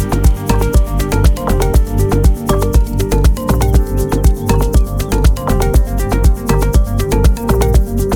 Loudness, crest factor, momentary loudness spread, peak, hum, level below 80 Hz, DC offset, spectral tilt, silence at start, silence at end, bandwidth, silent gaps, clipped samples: -14 LUFS; 12 dB; 2 LU; 0 dBFS; none; -14 dBFS; under 0.1%; -6.5 dB/octave; 0 s; 0 s; 19 kHz; none; under 0.1%